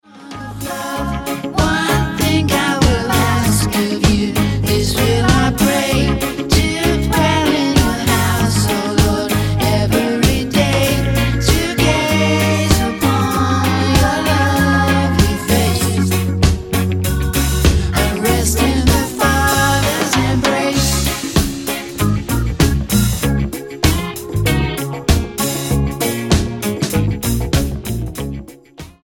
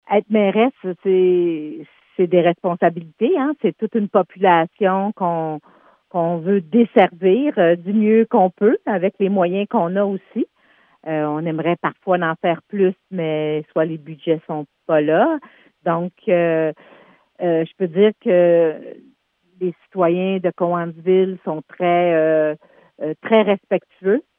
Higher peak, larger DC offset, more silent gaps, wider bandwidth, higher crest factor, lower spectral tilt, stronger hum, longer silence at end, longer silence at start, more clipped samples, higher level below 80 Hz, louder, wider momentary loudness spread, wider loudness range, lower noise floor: about the same, 0 dBFS vs 0 dBFS; neither; neither; first, 17 kHz vs 3.7 kHz; about the same, 14 dB vs 18 dB; second, -5 dB/octave vs -10.5 dB/octave; neither; about the same, 0.15 s vs 0.15 s; about the same, 0.15 s vs 0.1 s; neither; first, -24 dBFS vs -78 dBFS; first, -15 LUFS vs -19 LUFS; second, 7 LU vs 11 LU; about the same, 3 LU vs 5 LU; second, -37 dBFS vs -58 dBFS